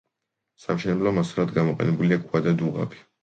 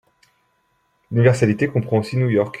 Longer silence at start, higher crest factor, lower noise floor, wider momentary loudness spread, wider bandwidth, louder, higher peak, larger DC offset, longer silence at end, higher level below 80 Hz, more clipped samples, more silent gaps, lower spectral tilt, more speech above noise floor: second, 0.7 s vs 1.1 s; about the same, 18 dB vs 18 dB; first, -82 dBFS vs -65 dBFS; first, 8 LU vs 5 LU; second, 8.2 kHz vs 10.5 kHz; second, -24 LUFS vs -19 LUFS; second, -8 dBFS vs -2 dBFS; neither; first, 0.25 s vs 0 s; about the same, -58 dBFS vs -56 dBFS; neither; neither; about the same, -8 dB/octave vs -7.5 dB/octave; first, 58 dB vs 48 dB